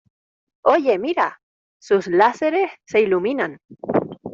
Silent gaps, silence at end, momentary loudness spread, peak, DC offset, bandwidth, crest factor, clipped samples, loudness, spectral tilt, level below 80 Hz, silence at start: 1.43-1.80 s, 3.65-3.69 s; 0 s; 7 LU; -2 dBFS; under 0.1%; 7.6 kHz; 18 dB; under 0.1%; -20 LUFS; -6 dB/octave; -64 dBFS; 0.65 s